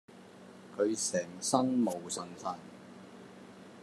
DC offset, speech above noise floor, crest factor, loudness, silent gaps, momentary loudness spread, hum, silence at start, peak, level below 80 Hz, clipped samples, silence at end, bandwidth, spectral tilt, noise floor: under 0.1%; 20 dB; 22 dB; -33 LUFS; none; 23 LU; none; 0.1 s; -12 dBFS; -84 dBFS; under 0.1%; 0 s; 13.5 kHz; -4 dB/octave; -53 dBFS